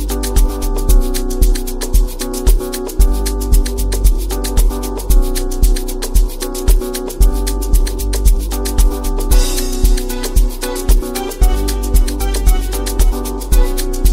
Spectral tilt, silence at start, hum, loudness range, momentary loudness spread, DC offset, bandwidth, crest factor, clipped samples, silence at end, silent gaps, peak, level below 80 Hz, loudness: -5 dB/octave; 0 s; none; 1 LU; 4 LU; 0.4%; 16.5 kHz; 12 dB; under 0.1%; 0 s; none; 0 dBFS; -14 dBFS; -17 LUFS